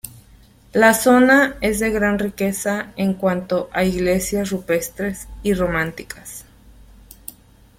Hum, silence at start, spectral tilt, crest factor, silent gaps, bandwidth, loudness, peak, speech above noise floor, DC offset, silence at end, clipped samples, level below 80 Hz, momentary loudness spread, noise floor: none; 0.05 s; -5 dB/octave; 18 dB; none; 16.5 kHz; -19 LUFS; -2 dBFS; 30 dB; under 0.1%; 1.35 s; under 0.1%; -42 dBFS; 21 LU; -49 dBFS